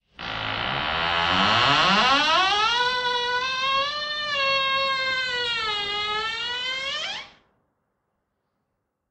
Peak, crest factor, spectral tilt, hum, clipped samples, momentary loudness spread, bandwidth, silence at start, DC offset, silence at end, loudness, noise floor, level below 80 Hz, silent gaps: -6 dBFS; 20 dB; -2.5 dB/octave; none; under 0.1%; 9 LU; 8.6 kHz; 0.2 s; under 0.1%; 1.8 s; -22 LUFS; -78 dBFS; -54 dBFS; none